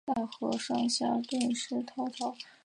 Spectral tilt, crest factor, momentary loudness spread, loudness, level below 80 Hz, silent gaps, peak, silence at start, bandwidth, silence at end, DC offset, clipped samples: -3.5 dB/octave; 16 dB; 8 LU; -33 LUFS; -74 dBFS; none; -16 dBFS; 0.05 s; 11 kHz; 0.15 s; under 0.1%; under 0.1%